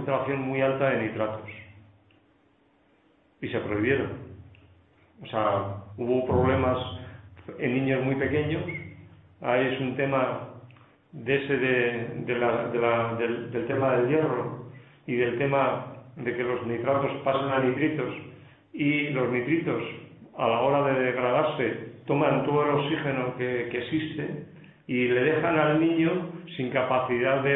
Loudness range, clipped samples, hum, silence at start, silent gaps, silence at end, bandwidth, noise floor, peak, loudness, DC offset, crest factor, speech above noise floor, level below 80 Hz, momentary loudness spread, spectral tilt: 5 LU; under 0.1%; none; 0 s; none; 0 s; 4 kHz; -64 dBFS; -8 dBFS; -26 LUFS; under 0.1%; 18 dB; 38 dB; -58 dBFS; 15 LU; -11 dB/octave